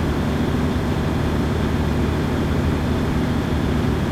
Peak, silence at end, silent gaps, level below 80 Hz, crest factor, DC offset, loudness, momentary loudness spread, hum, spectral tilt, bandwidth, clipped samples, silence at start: -8 dBFS; 0 s; none; -28 dBFS; 12 dB; under 0.1%; -21 LUFS; 1 LU; none; -7 dB/octave; 15.5 kHz; under 0.1%; 0 s